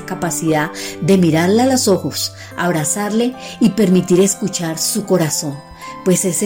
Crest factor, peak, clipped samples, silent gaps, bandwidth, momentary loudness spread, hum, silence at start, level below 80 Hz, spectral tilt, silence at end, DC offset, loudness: 12 dB; -2 dBFS; under 0.1%; none; 16.5 kHz; 9 LU; none; 0 s; -52 dBFS; -4.5 dB/octave; 0 s; under 0.1%; -16 LUFS